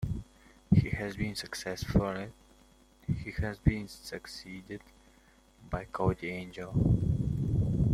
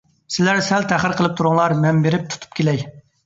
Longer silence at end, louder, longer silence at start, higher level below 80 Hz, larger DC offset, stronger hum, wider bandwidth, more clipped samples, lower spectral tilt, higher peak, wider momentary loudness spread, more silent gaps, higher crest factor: second, 0 s vs 0.25 s; second, -33 LUFS vs -18 LUFS; second, 0 s vs 0.3 s; first, -44 dBFS vs -54 dBFS; neither; neither; first, 14.5 kHz vs 8 kHz; neither; first, -7 dB/octave vs -5.5 dB/octave; second, -10 dBFS vs -2 dBFS; first, 16 LU vs 9 LU; neither; about the same, 22 dB vs 18 dB